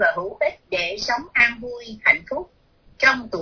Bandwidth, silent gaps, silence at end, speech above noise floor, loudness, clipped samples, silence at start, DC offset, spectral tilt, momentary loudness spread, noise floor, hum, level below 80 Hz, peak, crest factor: 5.4 kHz; none; 0 s; 29 dB; -20 LUFS; under 0.1%; 0 s; under 0.1%; -3 dB/octave; 14 LU; -50 dBFS; none; -52 dBFS; -2 dBFS; 20 dB